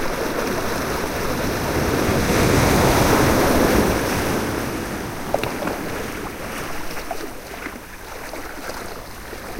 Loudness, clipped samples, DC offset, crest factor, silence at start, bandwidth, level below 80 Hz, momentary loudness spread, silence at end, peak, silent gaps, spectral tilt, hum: -21 LUFS; under 0.1%; under 0.1%; 18 dB; 0 s; 16 kHz; -32 dBFS; 16 LU; 0 s; -4 dBFS; none; -4.5 dB/octave; none